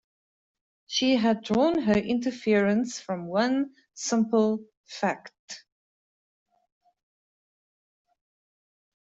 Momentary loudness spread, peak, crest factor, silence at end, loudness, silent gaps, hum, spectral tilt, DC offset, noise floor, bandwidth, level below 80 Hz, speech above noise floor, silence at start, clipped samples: 16 LU; -10 dBFS; 18 dB; 3.55 s; -26 LUFS; 4.77-4.84 s, 5.39-5.48 s; none; -4.5 dB/octave; under 0.1%; under -90 dBFS; 8 kHz; -64 dBFS; over 65 dB; 0.9 s; under 0.1%